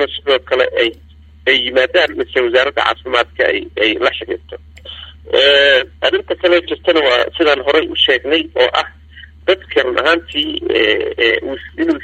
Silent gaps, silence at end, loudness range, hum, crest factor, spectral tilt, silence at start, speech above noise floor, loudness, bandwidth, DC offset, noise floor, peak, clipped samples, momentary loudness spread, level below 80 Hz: none; 0 s; 3 LU; none; 14 dB; -4 dB/octave; 0 s; 24 dB; -14 LUFS; 8.8 kHz; under 0.1%; -38 dBFS; 0 dBFS; under 0.1%; 10 LU; -44 dBFS